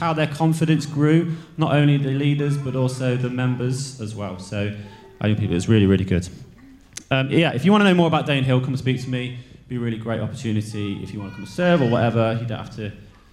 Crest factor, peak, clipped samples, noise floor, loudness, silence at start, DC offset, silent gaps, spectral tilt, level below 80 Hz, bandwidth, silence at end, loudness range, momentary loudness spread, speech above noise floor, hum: 18 dB; -4 dBFS; under 0.1%; -46 dBFS; -21 LUFS; 0 s; under 0.1%; none; -7 dB/octave; -50 dBFS; 13 kHz; 0.25 s; 5 LU; 15 LU; 26 dB; none